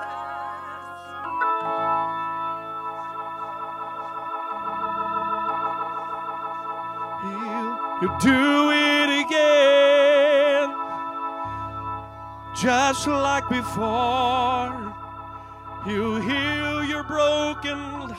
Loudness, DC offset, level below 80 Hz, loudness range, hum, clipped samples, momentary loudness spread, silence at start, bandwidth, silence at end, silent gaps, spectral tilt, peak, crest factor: -23 LUFS; under 0.1%; -50 dBFS; 10 LU; none; under 0.1%; 16 LU; 0 s; 14.5 kHz; 0 s; none; -4 dB/octave; -6 dBFS; 18 dB